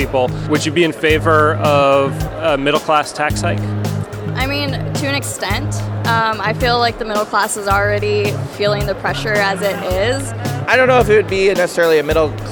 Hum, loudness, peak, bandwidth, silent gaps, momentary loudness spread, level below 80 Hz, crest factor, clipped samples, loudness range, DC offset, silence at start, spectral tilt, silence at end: none; -16 LUFS; 0 dBFS; over 20 kHz; none; 8 LU; -34 dBFS; 16 dB; under 0.1%; 4 LU; under 0.1%; 0 s; -5 dB/octave; 0 s